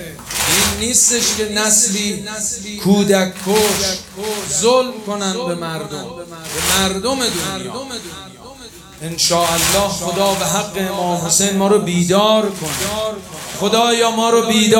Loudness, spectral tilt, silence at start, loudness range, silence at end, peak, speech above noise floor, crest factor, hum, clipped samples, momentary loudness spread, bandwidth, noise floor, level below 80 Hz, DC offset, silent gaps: -15 LUFS; -3 dB/octave; 0 s; 5 LU; 0 s; 0 dBFS; 21 dB; 16 dB; none; under 0.1%; 15 LU; 19 kHz; -37 dBFS; -44 dBFS; under 0.1%; none